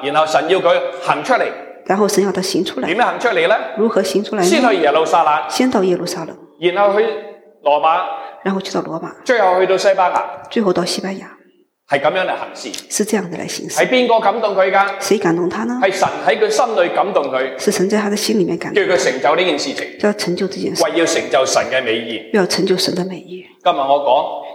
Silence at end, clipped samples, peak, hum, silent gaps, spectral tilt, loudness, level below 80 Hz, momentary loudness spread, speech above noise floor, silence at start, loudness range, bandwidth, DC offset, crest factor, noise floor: 0 s; under 0.1%; -2 dBFS; none; none; -4 dB/octave; -16 LUFS; -66 dBFS; 9 LU; 38 dB; 0 s; 3 LU; 16.5 kHz; under 0.1%; 16 dB; -53 dBFS